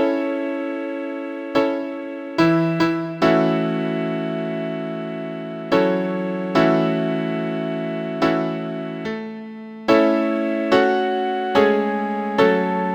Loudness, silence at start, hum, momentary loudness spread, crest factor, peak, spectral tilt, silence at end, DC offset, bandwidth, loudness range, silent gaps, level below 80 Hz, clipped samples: -21 LUFS; 0 s; none; 11 LU; 18 dB; -2 dBFS; -7 dB/octave; 0 s; under 0.1%; 8.8 kHz; 3 LU; none; -58 dBFS; under 0.1%